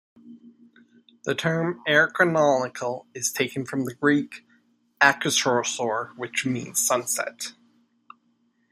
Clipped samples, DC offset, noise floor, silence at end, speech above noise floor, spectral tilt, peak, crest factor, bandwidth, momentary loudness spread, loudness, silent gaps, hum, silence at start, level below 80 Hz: under 0.1%; under 0.1%; -68 dBFS; 1.2 s; 43 dB; -3 dB/octave; -2 dBFS; 24 dB; 15.5 kHz; 12 LU; -23 LUFS; none; none; 0.25 s; -72 dBFS